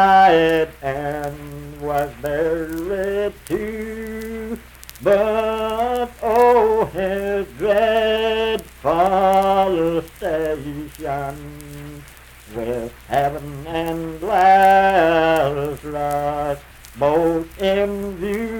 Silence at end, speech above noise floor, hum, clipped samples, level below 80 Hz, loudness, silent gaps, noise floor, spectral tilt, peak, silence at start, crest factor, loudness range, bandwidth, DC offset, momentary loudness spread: 0 s; 23 dB; none; under 0.1%; -42 dBFS; -19 LUFS; none; -42 dBFS; -5.5 dB/octave; -4 dBFS; 0 s; 16 dB; 9 LU; 19 kHz; under 0.1%; 16 LU